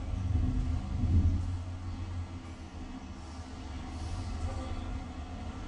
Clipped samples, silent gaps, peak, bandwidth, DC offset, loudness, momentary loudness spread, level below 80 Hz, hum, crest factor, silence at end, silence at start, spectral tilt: under 0.1%; none; -16 dBFS; 9.4 kHz; under 0.1%; -36 LUFS; 15 LU; -38 dBFS; none; 18 dB; 0 s; 0 s; -7 dB/octave